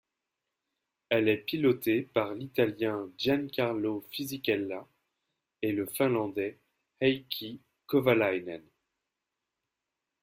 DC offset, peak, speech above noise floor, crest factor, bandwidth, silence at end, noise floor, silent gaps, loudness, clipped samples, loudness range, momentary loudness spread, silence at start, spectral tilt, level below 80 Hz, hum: under 0.1%; -12 dBFS; 58 dB; 20 dB; 16 kHz; 1.6 s; -87 dBFS; none; -30 LUFS; under 0.1%; 3 LU; 11 LU; 1.1 s; -5.5 dB/octave; -70 dBFS; none